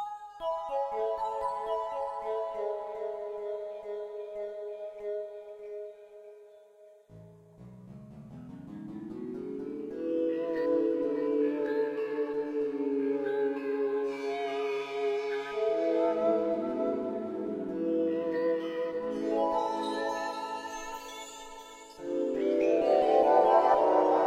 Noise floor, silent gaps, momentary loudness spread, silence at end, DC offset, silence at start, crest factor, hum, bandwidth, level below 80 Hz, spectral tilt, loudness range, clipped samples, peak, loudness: -57 dBFS; none; 18 LU; 0 s; under 0.1%; 0 s; 20 dB; none; 14 kHz; -68 dBFS; -5.5 dB/octave; 13 LU; under 0.1%; -10 dBFS; -31 LUFS